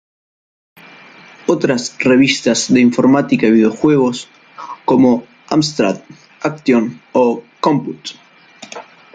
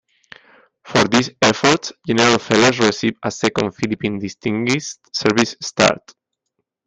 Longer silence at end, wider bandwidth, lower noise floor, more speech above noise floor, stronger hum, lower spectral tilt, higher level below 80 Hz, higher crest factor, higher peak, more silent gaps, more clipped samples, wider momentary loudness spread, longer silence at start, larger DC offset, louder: second, 0.35 s vs 0.9 s; about the same, 9.2 kHz vs 9.8 kHz; second, -40 dBFS vs -76 dBFS; second, 27 dB vs 58 dB; neither; about the same, -5 dB/octave vs -4 dB/octave; about the same, -56 dBFS vs -54 dBFS; about the same, 16 dB vs 18 dB; about the same, 0 dBFS vs 0 dBFS; neither; neither; first, 19 LU vs 9 LU; first, 1.5 s vs 0.85 s; neither; first, -14 LUFS vs -17 LUFS